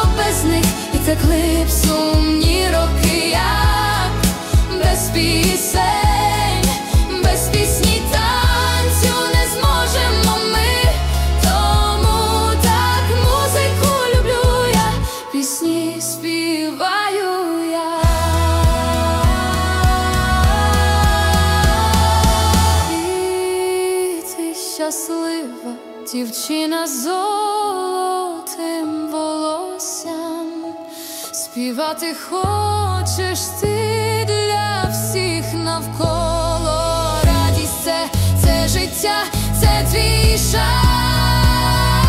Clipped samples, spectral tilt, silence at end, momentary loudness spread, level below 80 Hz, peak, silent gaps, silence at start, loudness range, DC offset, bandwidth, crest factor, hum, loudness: under 0.1%; -4.5 dB/octave; 0 s; 8 LU; -22 dBFS; -4 dBFS; none; 0 s; 6 LU; under 0.1%; 16 kHz; 14 dB; none; -17 LUFS